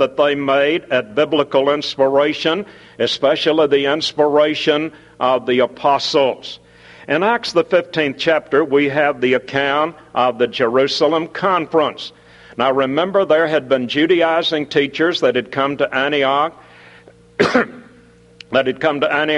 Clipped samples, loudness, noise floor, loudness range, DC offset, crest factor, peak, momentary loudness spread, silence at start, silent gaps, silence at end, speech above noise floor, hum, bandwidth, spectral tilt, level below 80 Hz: under 0.1%; -16 LUFS; -47 dBFS; 2 LU; under 0.1%; 16 dB; 0 dBFS; 6 LU; 0 s; none; 0 s; 30 dB; none; 11 kHz; -5 dB/octave; -58 dBFS